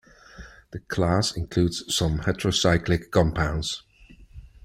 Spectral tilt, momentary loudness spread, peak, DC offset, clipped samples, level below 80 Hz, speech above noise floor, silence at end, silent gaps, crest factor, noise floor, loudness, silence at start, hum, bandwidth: -5 dB/octave; 12 LU; -6 dBFS; under 0.1%; under 0.1%; -40 dBFS; 27 dB; 0.2 s; none; 18 dB; -51 dBFS; -24 LUFS; 0.35 s; none; 15.5 kHz